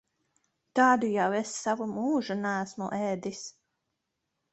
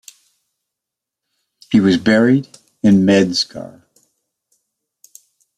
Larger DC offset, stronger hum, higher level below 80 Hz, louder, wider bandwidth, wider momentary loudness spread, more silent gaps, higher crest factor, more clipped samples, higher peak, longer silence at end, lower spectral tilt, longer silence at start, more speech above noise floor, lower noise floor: neither; neither; second, -74 dBFS vs -56 dBFS; second, -29 LUFS vs -14 LUFS; second, 8.4 kHz vs 13 kHz; about the same, 12 LU vs 11 LU; neither; about the same, 20 dB vs 16 dB; neither; second, -10 dBFS vs -2 dBFS; second, 1.05 s vs 1.9 s; second, -4.5 dB/octave vs -6 dB/octave; second, 0.75 s vs 1.7 s; second, 54 dB vs 70 dB; about the same, -82 dBFS vs -83 dBFS